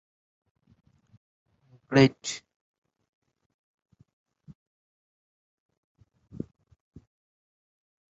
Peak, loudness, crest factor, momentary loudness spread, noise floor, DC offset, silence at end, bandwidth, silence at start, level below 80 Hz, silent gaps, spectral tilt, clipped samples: -6 dBFS; -25 LUFS; 28 dB; 21 LU; under -90 dBFS; under 0.1%; 5.75 s; 7.6 kHz; 1.9 s; -66 dBFS; none; -5.5 dB/octave; under 0.1%